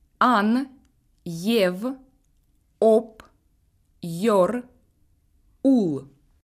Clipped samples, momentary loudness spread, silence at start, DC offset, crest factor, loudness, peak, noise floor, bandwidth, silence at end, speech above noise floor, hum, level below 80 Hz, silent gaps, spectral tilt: under 0.1%; 18 LU; 0.2 s; under 0.1%; 18 dB; -22 LUFS; -6 dBFS; -64 dBFS; 15.5 kHz; 0.4 s; 43 dB; none; -62 dBFS; none; -6 dB/octave